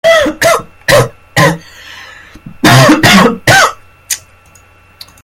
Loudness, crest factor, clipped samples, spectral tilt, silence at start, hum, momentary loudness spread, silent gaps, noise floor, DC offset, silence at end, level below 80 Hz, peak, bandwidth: -8 LUFS; 10 dB; 2%; -4 dB/octave; 0.05 s; none; 16 LU; none; -42 dBFS; under 0.1%; 1.05 s; -36 dBFS; 0 dBFS; over 20 kHz